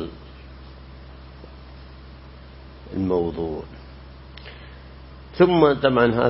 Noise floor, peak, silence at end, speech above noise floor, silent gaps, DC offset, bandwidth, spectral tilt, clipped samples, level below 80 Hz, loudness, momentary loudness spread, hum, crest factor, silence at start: -42 dBFS; -2 dBFS; 0 s; 23 dB; none; under 0.1%; 5.8 kHz; -11 dB/octave; under 0.1%; -44 dBFS; -20 LUFS; 26 LU; none; 22 dB; 0 s